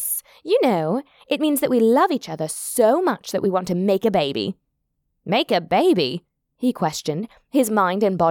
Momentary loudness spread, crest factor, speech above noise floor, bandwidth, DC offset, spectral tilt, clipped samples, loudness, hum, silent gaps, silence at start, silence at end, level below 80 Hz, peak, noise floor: 10 LU; 16 dB; 54 dB; 19 kHz; under 0.1%; -4.5 dB/octave; under 0.1%; -21 LUFS; none; none; 0 s; 0 s; -62 dBFS; -6 dBFS; -73 dBFS